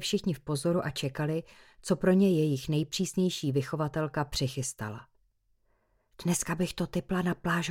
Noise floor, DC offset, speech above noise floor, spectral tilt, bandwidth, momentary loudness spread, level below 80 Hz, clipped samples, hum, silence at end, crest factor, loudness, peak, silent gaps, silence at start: -71 dBFS; under 0.1%; 41 dB; -5.5 dB/octave; 17 kHz; 10 LU; -56 dBFS; under 0.1%; none; 0 s; 18 dB; -30 LUFS; -12 dBFS; none; 0 s